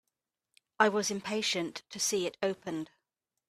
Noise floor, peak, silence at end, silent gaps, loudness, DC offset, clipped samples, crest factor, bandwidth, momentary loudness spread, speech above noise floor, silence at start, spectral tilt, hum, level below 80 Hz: -87 dBFS; -10 dBFS; 0.65 s; none; -32 LUFS; under 0.1%; under 0.1%; 24 dB; 15 kHz; 12 LU; 55 dB; 0.8 s; -2.5 dB/octave; none; -76 dBFS